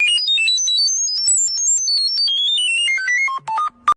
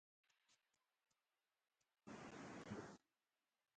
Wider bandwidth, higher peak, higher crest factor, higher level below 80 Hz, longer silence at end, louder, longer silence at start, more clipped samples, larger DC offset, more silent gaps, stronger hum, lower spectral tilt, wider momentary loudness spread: first, 12.5 kHz vs 9 kHz; first, -6 dBFS vs -40 dBFS; second, 10 dB vs 22 dB; first, -62 dBFS vs -86 dBFS; second, 0.05 s vs 0.8 s; first, -15 LUFS vs -57 LUFS; second, 0 s vs 0.5 s; neither; neither; neither; neither; second, 5 dB/octave vs -5 dB/octave; second, 5 LU vs 13 LU